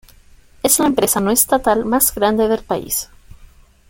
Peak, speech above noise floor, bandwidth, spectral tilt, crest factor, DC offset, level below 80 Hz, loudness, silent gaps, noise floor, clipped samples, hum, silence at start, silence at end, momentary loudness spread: 0 dBFS; 30 dB; 17 kHz; -3 dB/octave; 18 dB; under 0.1%; -42 dBFS; -16 LUFS; none; -46 dBFS; under 0.1%; none; 0.65 s; 0.45 s; 8 LU